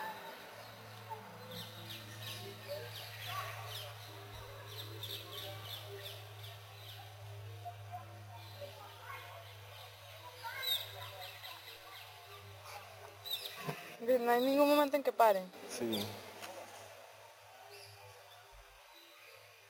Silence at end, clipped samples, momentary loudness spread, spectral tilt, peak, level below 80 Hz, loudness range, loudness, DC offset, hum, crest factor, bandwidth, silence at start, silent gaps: 0 s; under 0.1%; 23 LU; -4.5 dB/octave; -14 dBFS; -74 dBFS; 16 LU; -39 LUFS; under 0.1%; none; 26 dB; 16.5 kHz; 0 s; none